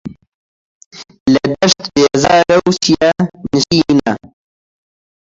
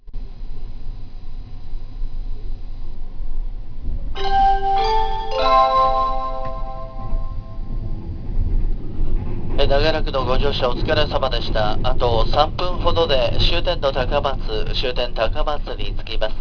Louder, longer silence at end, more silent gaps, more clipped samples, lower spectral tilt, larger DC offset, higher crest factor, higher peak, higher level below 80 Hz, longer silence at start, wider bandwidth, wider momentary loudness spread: first, -13 LUFS vs -21 LUFS; first, 1.1 s vs 0 s; first, 0.27-0.91 s, 1.20-1.26 s vs none; neither; second, -4.5 dB/octave vs -6.5 dB/octave; neither; about the same, 14 dB vs 18 dB; about the same, 0 dBFS vs 0 dBFS; second, -44 dBFS vs -22 dBFS; about the same, 0.05 s vs 0.05 s; first, 8 kHz vs 5.4 kHz; second, 9 LU vs 20 LU